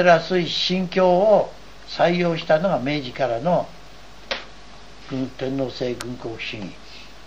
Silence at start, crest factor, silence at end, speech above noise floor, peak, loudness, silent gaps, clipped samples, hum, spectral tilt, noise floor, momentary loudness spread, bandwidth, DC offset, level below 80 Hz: 0 s; 18 dB; 0 s; 24 dB; -4 dBFS; -22 LUFS; none; under 0.1%; none; -5.5 dB/octave; -44 dBFS; 17 LU; 12 kHz; 0.9%; -50 dBFS